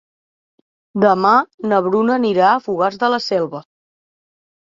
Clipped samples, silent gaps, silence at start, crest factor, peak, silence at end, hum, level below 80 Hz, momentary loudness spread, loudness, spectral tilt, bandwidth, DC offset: under 0.1%; 1.54-1.58 s; 0.95 s; 16 dB; -2 dBFS; 1.1 s; none; -64 dBFS; 8 LU; -16 LUFS; -6.5 dB/octave; 7.6 kHz; under 0.1%